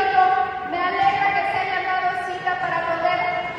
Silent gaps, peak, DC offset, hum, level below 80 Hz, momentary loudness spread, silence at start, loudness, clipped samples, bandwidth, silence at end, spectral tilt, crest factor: none; -4 dBFS; under 0.1%; none; -56 dBFS; 6 LU; 0 s; -21 LUFS; under 0.1%; 9.4 kHz; 0 s; -4.5 dB/octave; 16 dB